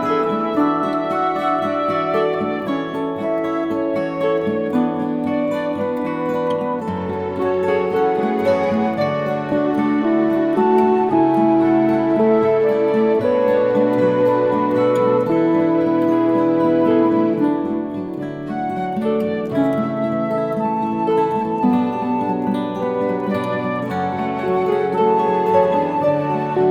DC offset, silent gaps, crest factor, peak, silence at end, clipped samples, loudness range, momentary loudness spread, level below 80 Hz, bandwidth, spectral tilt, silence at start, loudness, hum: under 0.1%; none; 14 dB; -4 dBFS; 0 s; under 0.1%; 5 LU; 6 LU; -58 dBFS; 9.6 kHz; -8.5 dB/octave; 0 s; -18 LUFS; none